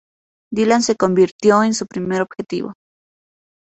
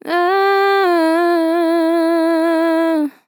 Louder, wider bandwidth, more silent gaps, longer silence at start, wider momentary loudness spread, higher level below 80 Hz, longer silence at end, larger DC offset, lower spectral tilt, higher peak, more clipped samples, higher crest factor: about the same, -17 LUFS vs -15 LUFS; second, 8.2 kHz vs 18 kHz; first, 1.31-1.39 s vs none; first, 0.5 s vs 0.05 s; first, 12 LU vs 2 LU; first, -58 dBFS vs under -90 dBFS; first, 1.05 s vs 0.15 s; neither; first, -5 dB/octave vs -3 dB/octave; about the same, -2 dBFS vs -4 dBFS; neither; first, 18 dB vs 10 dB